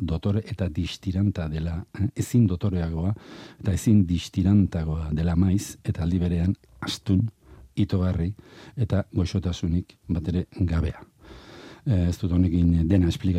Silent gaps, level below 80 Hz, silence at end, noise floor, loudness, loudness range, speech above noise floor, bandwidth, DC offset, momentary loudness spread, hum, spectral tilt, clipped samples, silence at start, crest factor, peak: none; -42 dBFS; 0 s; -46 dBFS; -25 LUFS; 4 LU; 22 dB; 14 kHz; under 0.1%; 11 LU; none; -7.5 dB/octave; under 0.1%; 0 s; 16 dB; -8 dBFS